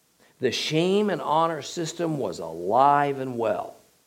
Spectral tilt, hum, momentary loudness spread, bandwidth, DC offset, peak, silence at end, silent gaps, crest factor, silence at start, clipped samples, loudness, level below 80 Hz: -5 dB/octave; none; 11 LU; 16.5 kHz; under 0.1%; -6 dBFS; 0.35 s; none; 18 dB; 0.4 s; under 0.1%; -25 LUFS; -72 dBFS